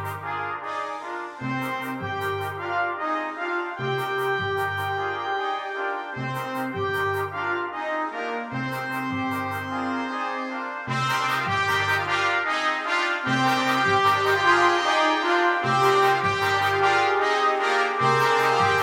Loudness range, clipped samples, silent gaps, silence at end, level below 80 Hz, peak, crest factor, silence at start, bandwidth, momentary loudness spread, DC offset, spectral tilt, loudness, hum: 8 LU; under 0.1%; none; 0 s; -66 dBFS; -6 dBFS; 18 dB; 0 s; 17.5 kHz; 10 LU; under 0.1%; -4.5 dB/octave; -24 LUFS; none